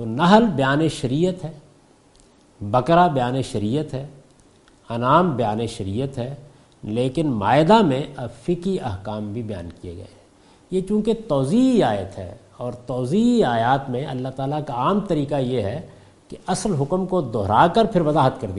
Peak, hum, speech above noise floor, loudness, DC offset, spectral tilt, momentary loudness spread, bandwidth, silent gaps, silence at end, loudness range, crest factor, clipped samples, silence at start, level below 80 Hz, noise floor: 0 dBFS; none; 33 dB; -20 LUFS; under 0.1%; -6.5 dB/octave; 17 LU; 11.5 kHz; none; 0 s; 4 LU; 20 dB; under 0.1%; 0 s; -48 dBFS; -53 dBFS